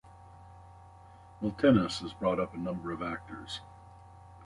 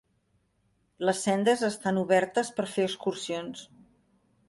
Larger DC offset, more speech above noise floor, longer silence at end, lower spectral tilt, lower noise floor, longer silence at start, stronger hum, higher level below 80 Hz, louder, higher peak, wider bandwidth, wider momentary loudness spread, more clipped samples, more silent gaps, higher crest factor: neither; second, 23 dB vs 44 dB; second, 0 s vs 0.85 s; first, -6.5 dB/octave vs -4.5 dB/octave; second, -54 dBFS vs -71 dBFS; second, 0.05 s vs 1 s; neither; first, -56 dBFS vs -72 dBFS; second, -32 LUFS vs -28 LUFS; about the same, -10 dBFS vs -10 dBFS; about the same, 11.5 kHz vs 11.5 kHz; first, 28 LU vs 10 LU; neither; neither; about the same, 22 dB vs 20 dB